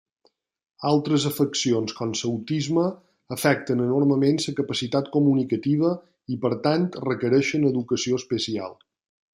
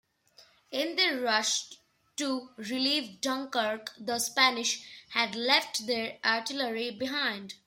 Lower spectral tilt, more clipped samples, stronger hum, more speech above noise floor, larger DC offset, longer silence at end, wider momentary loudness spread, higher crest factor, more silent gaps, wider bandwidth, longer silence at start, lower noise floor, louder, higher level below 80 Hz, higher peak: first, -5.5 dB/octave vs -1 dB/octave; neither; neither; first, 44 dB vs 30 dB; neither; first, 0.65 s vs 0.1 s; second, 7 LU vs 11 LU; about the same, 20 dB vs 24 dB; neither; about the same, 16 kHz vs 16.5 kHz; first, 0.8 s vs 0.4 s; first, -67 dBFS vs -61 dBFS; first, -24 LUFS vs -29 LUFS; first, -66 dBFS vs -78 dBFS; first, -4 dBFS vs -8 dBFS